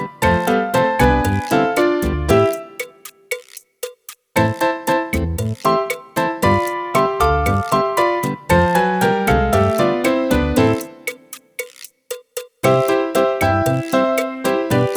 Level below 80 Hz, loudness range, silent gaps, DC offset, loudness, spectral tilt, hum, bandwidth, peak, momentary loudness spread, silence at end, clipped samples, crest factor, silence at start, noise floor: -32 dBFS; 4 LU; none; under 0.1%; -17 LUFS; -5.5 dB/octave; none; over 20 kHz; 0 dBFS; 15 LU; 0 s; under 0.1%; 16 dB; 0 s; -38 dBFS